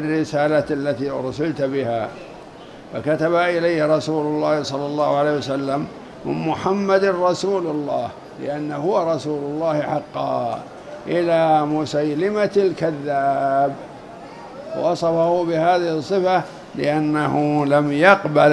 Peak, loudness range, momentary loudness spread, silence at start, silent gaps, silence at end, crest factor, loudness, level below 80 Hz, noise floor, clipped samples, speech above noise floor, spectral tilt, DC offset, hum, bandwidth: 0 dBFS; 3 LU; 14 LU; 0 s; none; 0 s; 20 dB; -20 LUFS; -56 dBFS; -39 dBFS; under 0.1%; 20 dB; -6.5 dB/octave; under 0.1%; none; 11.5 kHz